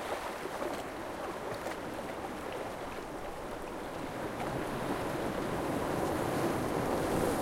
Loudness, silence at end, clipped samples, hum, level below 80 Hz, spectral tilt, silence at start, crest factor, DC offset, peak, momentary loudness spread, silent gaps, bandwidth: -36 LUFS; 0 s; under 0.1%; none; -52 dBFS; -5 dB/octave; 0 s; 18 dB; under 0.1%; -18 dBFS; 8 LU; none; 16 kHz